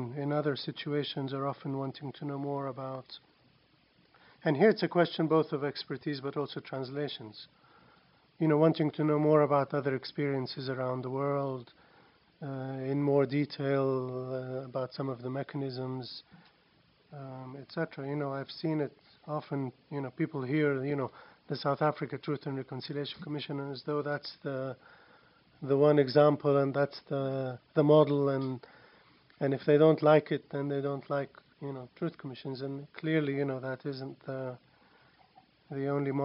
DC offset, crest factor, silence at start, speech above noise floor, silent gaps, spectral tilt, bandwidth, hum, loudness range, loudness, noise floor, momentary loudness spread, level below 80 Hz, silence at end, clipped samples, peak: under 0.1%; 20 dB; 0 s; 36 dB; none; -10 dB/octave; 5.8 kHz; none; 10 LU; -32 LUFS; -67 dBFS; 16 LU; -78 dBFS; 0 s; under 0.1%; -10 dBFS